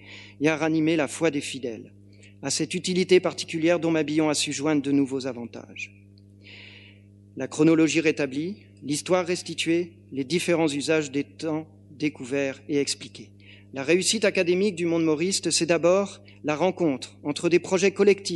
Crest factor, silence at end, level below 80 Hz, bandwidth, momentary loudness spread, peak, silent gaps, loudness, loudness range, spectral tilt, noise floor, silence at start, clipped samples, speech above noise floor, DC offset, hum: 18 dB; 0 s; -72 dBFS; 12 kHz; 15 LU; -6 dBFS; none; -24 LUFS; 4 LU; -4 dB/octave; -51 dBFS; 0 s; under 0.1%; 26 dB; under 0.1%; 50 Hz at -50 dBFS